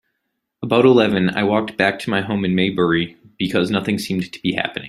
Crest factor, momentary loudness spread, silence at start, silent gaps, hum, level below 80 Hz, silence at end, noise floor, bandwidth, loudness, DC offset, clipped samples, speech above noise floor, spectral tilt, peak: 18 dB; 9 LU; 0.6 s; none; none; -54 dBFS; 0 s; -75 dBFS; 13.5 kHz; -18 LUFS; under 0.1%; under 0.1%; 57 dB; -6 dB/octave; -2 dBFS